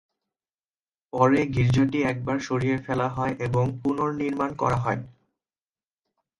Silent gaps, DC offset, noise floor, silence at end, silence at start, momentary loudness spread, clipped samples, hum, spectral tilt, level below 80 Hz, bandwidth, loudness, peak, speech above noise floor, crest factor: none; under 0.1%; under -90 dBFS; 1.3 s; 1.15 s; 7 LU; under 0.1%; none; -7.5 dB/octave; -50 dBFS; 10.5 kHz; -25 LUFS; -8 dBFS; over 66 dB; 18 dB